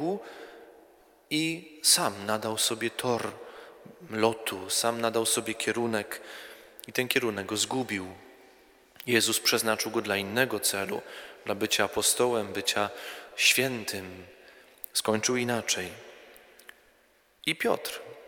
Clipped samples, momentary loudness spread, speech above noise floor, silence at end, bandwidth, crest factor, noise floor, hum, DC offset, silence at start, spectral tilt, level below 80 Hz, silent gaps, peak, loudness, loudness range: under 0.1%; 20 LU; 35 dB; 0 s; 19.5 kHz; 24 dB; -64 dBFS; none; under 0.1%; 0 s; -2 dB/octave; -70 dBFS; none; -6 dBFS; -28 LUFS; 4 LU